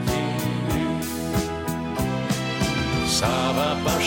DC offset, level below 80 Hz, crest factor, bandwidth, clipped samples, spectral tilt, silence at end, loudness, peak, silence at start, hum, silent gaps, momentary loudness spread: under 0.1%; -40 dBFS; 14 dB; 17 kHz; under 0.1%; -4.5 dB/octave; 0 s; -24 LUFS; -10 dBFS; 0 s; none; none; 5 LU